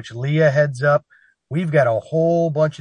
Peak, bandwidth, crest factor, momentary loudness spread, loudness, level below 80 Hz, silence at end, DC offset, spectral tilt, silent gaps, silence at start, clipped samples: -4 dBFS; 10 kHz; 16 dB; 6 LU; -18 LUFS; -62 dBFS; 0.05 s; under 0.1%; -7.5 dB/octave; none; 0 s; under 0.1%